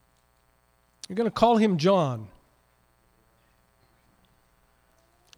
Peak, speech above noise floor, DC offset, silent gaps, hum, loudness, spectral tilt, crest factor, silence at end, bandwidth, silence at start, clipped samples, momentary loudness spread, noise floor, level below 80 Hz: -8 dBFS; 43 dB; under 0.1%; none; 60 Hz at -55 dBFS; -24 LUFS; -6.5 dB/octave; 20 dB; 3.1 s; 12 kHz; 1.1 s; under 0.1%; 21 LU; -66 dBFS; -60 dBFS